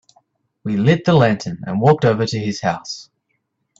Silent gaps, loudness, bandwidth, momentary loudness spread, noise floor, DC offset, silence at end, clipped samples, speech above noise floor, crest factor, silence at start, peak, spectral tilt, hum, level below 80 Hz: none; -17 LUFS; 7.8 kHz; 14 LU; -71 dBFS; under 0.1%; 0.75 s; under 0.1%; 54 dB; 18 dB; 0.65 s; 0 dBFS; -6.5 dB/octave; none; -52 dBFS